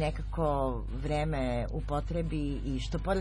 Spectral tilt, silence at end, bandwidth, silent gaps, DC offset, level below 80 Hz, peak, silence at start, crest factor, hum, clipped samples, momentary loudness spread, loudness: -7 dB/octave; 0 s; 10.5 kHz; none; under 0.1%; -36 dBFS; -18 dBFS; 0 s; 14 dB; none; under 0.1%; 4 LU; -33 LUFS